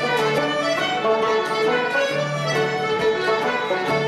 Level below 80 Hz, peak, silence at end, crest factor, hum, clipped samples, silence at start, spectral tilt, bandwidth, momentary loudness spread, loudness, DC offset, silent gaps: -60 dBFS; -8 dBFS; 0 s; 12 dB; none; under 0.1%; 0 s; -4.5 dB/octave; 14 kHz; 2 LU; -21 LUFS; under 0.1%; none